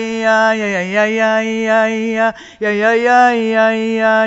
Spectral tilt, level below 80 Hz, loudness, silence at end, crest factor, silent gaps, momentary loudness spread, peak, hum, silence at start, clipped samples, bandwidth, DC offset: -4.5 dB/octave; -56 dBFS; -14 LUFS; 0 s; 14 dB; none; 6 LU; 0 dBFS; none; 0 s; under 0.1%; 8 kHz; under 0.1%